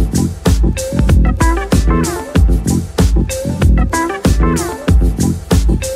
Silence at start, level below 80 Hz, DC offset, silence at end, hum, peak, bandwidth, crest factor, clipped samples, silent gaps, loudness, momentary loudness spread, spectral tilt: 0 s; -14 dBFS; under 0.1%; 0 s; none; -2 dBFS; 15.5 kHz; 10 dB; under 0.1%; none; -14 LUFS; 4 LU; -6 dB/octave